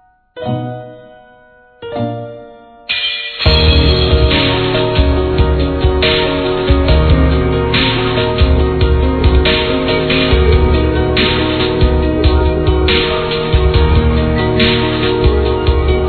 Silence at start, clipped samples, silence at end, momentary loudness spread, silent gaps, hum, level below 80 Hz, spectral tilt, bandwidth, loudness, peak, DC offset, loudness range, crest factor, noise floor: 0.35 s; under 0.1%; 0 s; 10 LU; none; none; -16 dBFS; -9 dB/octave; 4.6 kHz; -13 LUFS; 0 dBFS; under 0.1%; 2 LU; 12 dB; -44 dBFS